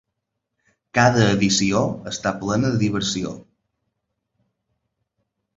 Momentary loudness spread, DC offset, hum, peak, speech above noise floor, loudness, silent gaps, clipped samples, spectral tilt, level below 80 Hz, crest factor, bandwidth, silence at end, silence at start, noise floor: 10 LU; under 0.1%; none; -2 dBFS; 60 dB; -20 LUFS; none; under 0.1%; -4.5 dB/octave; -50 dBFS; 22 dB; 8 kHz; 2.15 s; 0.95 s; -79 dBFS